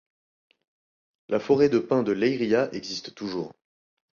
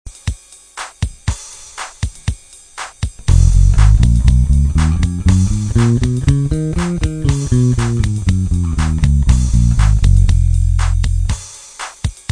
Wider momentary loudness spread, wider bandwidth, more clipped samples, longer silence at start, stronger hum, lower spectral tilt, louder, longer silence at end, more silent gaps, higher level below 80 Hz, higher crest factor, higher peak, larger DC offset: second, 13 LU vs 16 LU; second, 7.2 kHz vs 10.5 kHz; neither; first, 1.3 s vs 0.05 s; neither; about the same, -6 dB/octave vs -6.5 dB/octave; second, -25 LUFS vs -15 LUFS; first, 0.6 s vs 0.2 s; neither; second, -66 dBFS vs -16 dBFS; about the same, 18 dB vs 14 dB; second, -8 dBFS vs 0 dBFS; neither